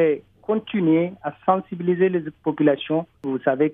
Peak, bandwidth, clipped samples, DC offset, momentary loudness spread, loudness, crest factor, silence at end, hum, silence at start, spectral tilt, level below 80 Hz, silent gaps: -4 dBFS; 3.9 kHz; under 0.1%; under 0.1%; 7 LU; -22 LUFS; 18 dB; 0 s; none; 0 s; -10 dB/octave; -64 dBFS; none